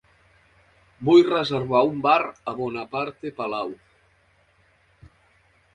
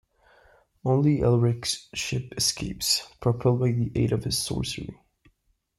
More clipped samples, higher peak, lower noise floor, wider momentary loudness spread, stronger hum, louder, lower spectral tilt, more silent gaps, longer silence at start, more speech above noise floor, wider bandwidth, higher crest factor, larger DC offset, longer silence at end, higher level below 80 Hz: neither; first, -4 dBFS vs -10 dBFS; second, -62 dBFS vs -68 dBFS; first, 14 LU vs 8 LU; neither; first, -22 LUFS vs -25 LUFS; first, -7 dB/octave vs -5 dB/octave; neither; first, 1 s vs 0.85 s; about the same, 40 dB vs 43 dB; second, 7.6 kHz vs 15 kHz; about the same, 20 dB vs 16 dB; neither; first, 2 s vs 0.85 s; second, -62 dBFS vs -48 dBFS